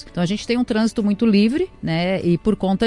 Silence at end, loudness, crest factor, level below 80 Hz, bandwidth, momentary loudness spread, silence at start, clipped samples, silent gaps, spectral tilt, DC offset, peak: 0 s; -19 LUFS; 14 dB; -44 dBFS; 11.5 kHz; 7 LU; 0 s; under 0.1%; none; -6.5 dB/octave; under 0.1%; -6 dBFS